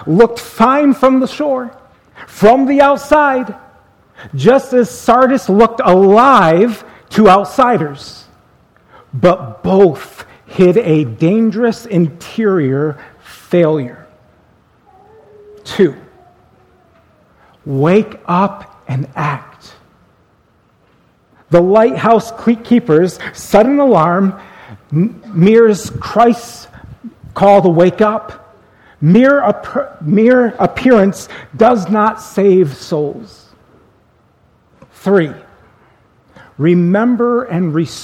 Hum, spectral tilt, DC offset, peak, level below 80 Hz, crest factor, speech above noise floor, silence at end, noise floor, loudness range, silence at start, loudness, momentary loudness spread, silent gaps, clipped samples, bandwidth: none; -7 dB/octave; under 0.1%; 0 dBFS; -46 dBFS; 12 dB; 42 dB; 0 s; -53 dBFS; 9 LU; 0 s; -12 LUFS; 14 LU; none; 0.2%; 16 kHz